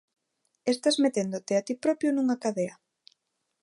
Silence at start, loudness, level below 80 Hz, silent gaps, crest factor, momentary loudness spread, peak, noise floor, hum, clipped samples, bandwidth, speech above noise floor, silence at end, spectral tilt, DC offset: 0.65 s; -28 LUFS; -80 dBFS; none; 16 dB; 8 LU; -12 dBFS; -74 dBFS; none; under 0.1%; 11.5 kHz; 47 dB; 0.9 s; -4.5 dB/octave; under 0.1%